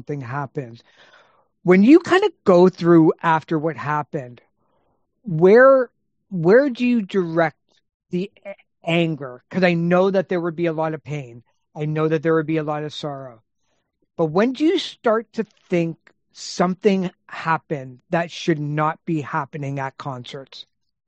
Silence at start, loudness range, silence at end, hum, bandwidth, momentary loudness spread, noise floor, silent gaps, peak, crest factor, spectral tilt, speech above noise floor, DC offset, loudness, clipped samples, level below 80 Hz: 0.1 s; 7 LU; 0.45 s; none; 8.4 kHz; 18 LU; -72 dBFS; 7.94-8.00 s; -2 dBFS; 18 dB; -7 dB/octave; 52 dB; under 0.1%; -19 LUFS; under 0.1%; -66 dBFS